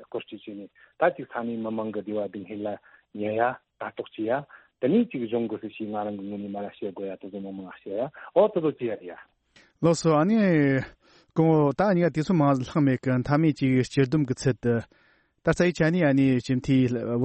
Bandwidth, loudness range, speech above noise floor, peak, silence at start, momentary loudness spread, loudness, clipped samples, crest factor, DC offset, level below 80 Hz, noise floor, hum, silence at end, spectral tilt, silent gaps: 8.4 kHz; 8 LU; 35 dB; -8 dBFS; 0 s; 15 LU; -25 LUFS; under 0.1%; 18 dB; under 0.1%; -56 dBFS; -60 dBFS; none; 0 s; -7.5 dB/octave; none